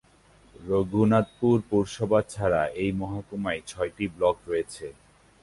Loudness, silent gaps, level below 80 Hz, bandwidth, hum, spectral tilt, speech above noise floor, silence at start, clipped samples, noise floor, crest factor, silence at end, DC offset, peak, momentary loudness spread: -26 LUFS; none; -52 dBFS; 11.5 kHz; none; -7 dB/octave; 32 dB; 0.6 s; under 0.1%; -57 dBFS; 18 dB; 0.5 s; under 0.1%; -8 dBFS; 10 LU